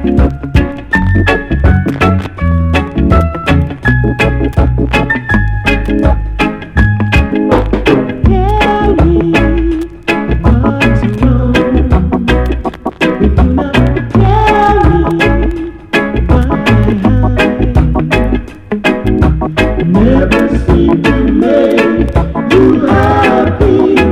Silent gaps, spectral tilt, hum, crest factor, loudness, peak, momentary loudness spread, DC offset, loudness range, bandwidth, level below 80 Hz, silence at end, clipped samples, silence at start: none; -7.5 dB/octave; none; 10 dB; -10 LUFS; 0 dBFS; 5 LU; under 0.1%; 2 LU; 11 kHz; -16 dBFS; 0 s; 0.4%; 0 s